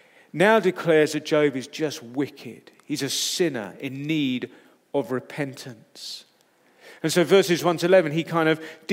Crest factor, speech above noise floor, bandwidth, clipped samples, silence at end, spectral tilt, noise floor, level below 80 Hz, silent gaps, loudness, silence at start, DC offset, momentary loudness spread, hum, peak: 20 dB; 38 dB; 16 kHz; under 0.1%; 0 s; -4.5 dB/octave; -61 dBFS; -80 dBFS; none; -23 LUFS; 0.35 s; under 0.1%; 18 LU; none; -4 dBFS